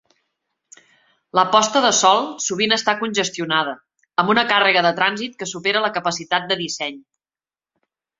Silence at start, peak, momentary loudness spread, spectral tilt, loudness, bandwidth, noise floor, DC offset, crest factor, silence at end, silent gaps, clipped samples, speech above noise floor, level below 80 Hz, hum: 1.35 s; 0 dBFS; 11 LU; -2 dB/octave; -18 LUFS; 8 kHz; under -90 dBFS; under 0.1%; 20 dB; 1.2 s; none; under 0.1%; over 71 dB; -66 dBFS; none